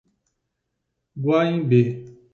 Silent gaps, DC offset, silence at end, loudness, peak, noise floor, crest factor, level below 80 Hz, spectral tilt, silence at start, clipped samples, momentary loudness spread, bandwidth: none; under 0.1%; 0.25 s; -21 LUFS; -6 dBFS; -78 dBFS; 18 dB; -64 dBFS; -9 dB/octave; 1.15 s; under 0.1%; 9 LU; 6.8 kHz